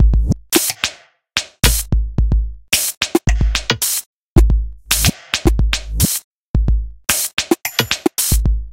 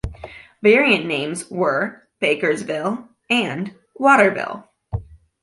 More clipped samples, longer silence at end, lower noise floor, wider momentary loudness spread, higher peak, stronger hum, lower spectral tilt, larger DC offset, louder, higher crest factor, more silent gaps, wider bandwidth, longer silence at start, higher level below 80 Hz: neither; second, 0 s vs 0.25 s; second, -35 dBFS vs -40 dBFS; second, 6 LU vs 17 LU; about the same, 0 dBFS vs -2 dBFS; neither; second, -3.5 dB/octave vs -5 dB/octave; neither; about the same, -17 LUFS vs -19 LUFS; about the same, 16 dB vs 18 dB; first, 2.97-3.01 s, 4.06-4.36 s, 6.24-6.54 s, 7.33-7.37 s vs none; first, 17 kHz vs 11.5 kHz; about the same, 0 s vs 0.05 s; first, -20 dBFS vs -44 dBFS